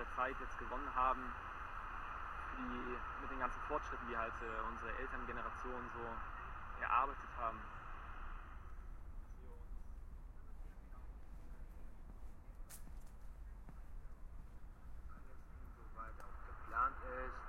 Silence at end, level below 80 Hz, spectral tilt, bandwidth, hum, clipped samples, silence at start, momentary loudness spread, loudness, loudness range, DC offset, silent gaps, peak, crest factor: 0 s; -52 dBFS; -5.5 dB/octave; 15.5 kHz; none; under 0.1%; 0 s; 19 LU; -44 LUFS; 15 LU; under 0.1%; none; -22 dBFS; 24 dB